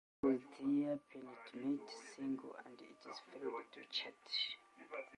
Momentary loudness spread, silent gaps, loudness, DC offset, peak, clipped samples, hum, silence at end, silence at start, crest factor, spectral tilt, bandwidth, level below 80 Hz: 15 LU; none; -43 LUFS; under 0.1%; -24 dBFS; under 0.1%; none; 0 s; 0.25 s; 20 dB; -4.5 dB/octave; 10.5 kHz; -82 dBFS